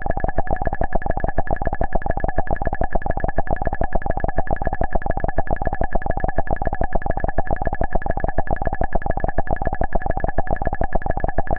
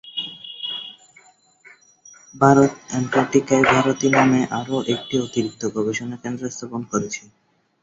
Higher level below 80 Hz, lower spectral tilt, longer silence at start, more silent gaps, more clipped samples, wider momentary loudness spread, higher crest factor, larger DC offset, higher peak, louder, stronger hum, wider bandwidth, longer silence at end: first, -24 dBFS vs -58 dBFS; first, -11 dB/octave vs -5 dB/octave; about the same, 0 s vs 0.05 s; neither; neither; second, 1 LU vs 14 LU; second, 14 dB vs 20 dB; neither; about the same, -4 dBFS vs -2 dBFS; second, -25 LUFS vs -20 LUFS; neither; second, 2.6 kHz vs 7.8 kHz; second, 0 s vs 0.65 s